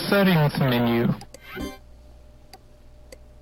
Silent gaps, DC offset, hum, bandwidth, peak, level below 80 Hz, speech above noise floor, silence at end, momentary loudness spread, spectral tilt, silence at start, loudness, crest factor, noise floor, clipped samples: none; under 0.1%; 60 Hz at -45 dBFS; 16.5 kHz; -6 dBFS; -48 dBFS; 27 dB; 0.85 s; 17 LU; -7 dB/octave; 0 s; -22 LUFS; 18 dB; -48 dBFS; under 0.1%